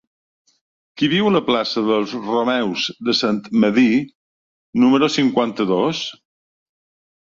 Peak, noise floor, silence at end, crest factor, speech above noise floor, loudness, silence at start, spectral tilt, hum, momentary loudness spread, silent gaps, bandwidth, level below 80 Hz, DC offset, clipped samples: -4 dBFS; under -90 dBFS; 1.2 s; 16 dB; over 73 dB; -18 LUFS; 0.95 s; -5.5 dB/octave; none; 7 LU; 4.15-4.73 s; 7.6 kHz; -62 dBFS; under 0.1%; under 0.1%